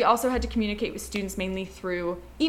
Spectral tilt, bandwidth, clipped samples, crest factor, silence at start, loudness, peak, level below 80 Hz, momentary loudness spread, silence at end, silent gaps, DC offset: -4.5 dB/octave; 17 kHz; under 0.1%; 20 dB; 0 s; -29 LUFS; -6 dBFS; -42 dBFS; 8 LU; 0 s; none; under 0.1%